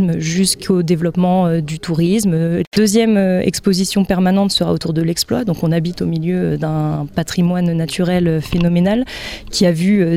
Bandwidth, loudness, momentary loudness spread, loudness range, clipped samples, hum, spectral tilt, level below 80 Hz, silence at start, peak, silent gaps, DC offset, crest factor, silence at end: 15.5 kHz; -16 LUFS; 6 LU; 3 LU; under 0.1%; none; -5.5 dB/octave; -40 dBFS; 0 s; -2 dBFS; 2.67-2.71 s; under 0.1%; 14 dB; 0 s